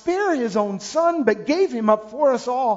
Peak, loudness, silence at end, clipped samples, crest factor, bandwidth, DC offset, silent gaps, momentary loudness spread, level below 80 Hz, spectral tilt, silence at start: -4 dBFS; -20 LUFS; 0 s; under 0.1%; 16 dB; 7.8 kHz; under 0.1%; none; 3 LU; -62 dBFS; -5 dB/octave; 0.05 s